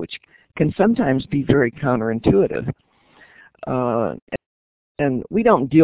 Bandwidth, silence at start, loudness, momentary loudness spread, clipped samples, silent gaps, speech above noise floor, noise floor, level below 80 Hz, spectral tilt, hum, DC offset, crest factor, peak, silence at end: 4 kHz; 0 s; -19 LUFS; 16 LU; under 0.1%; 4.22-4.27 s, 4.46-4.95 s; 33 dB; -52 dBFS; -44 dBFS; -12 dB/octave; none; under 0.1%; 18 dB; -2 dBFS; 0 s